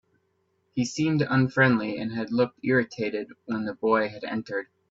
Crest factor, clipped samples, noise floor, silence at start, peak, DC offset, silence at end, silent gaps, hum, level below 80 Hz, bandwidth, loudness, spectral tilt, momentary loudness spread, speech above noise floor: 20 dB; under 0.1%; -72 dBFS; 0.75 s; -8 dBFS; under 0.1%; 0.25 s; none; none; -66 dBFS; 7.8 kHz; -26 LUFS; -6.5 dB/octave; 12 LU; 46 dB